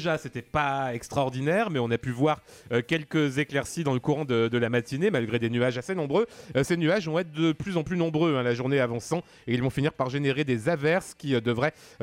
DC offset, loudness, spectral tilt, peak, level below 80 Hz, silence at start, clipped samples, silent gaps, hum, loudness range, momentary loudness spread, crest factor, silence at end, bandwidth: under 0.1%; -27 LUFS; -6 dB/octave; -12 dBFS; -56 dBFS; 0 s; under 0.1%; none; none; 1 LU; 5 LU; 14 dB; 0.15 s; 16 kHz